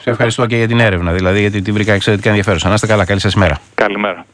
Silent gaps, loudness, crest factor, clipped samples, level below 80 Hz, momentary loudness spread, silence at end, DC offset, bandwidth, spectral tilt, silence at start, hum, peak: none; -13 LUFS; 12 dB; under 0.1%; -34 dBFS; 3 LU; 0.1 s; under 0.1%; 10.5 kHz; -5.5 dB/octave; 0.05 s; none; 0 dBFS